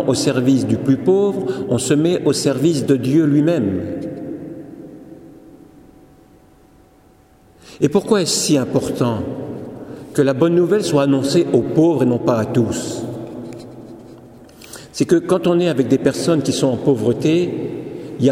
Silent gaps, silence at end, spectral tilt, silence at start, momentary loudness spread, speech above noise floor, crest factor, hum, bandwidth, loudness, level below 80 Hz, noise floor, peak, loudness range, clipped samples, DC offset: none; 0 s; -6 dB/octave; 0 s; 17 LU; 34 dB; 16 dB; none; 16 kHz; -17 LUFS; -54 dBFS; -50 dBFS; -2 dBFS; 7 LU; under 0.1%; under 0.1%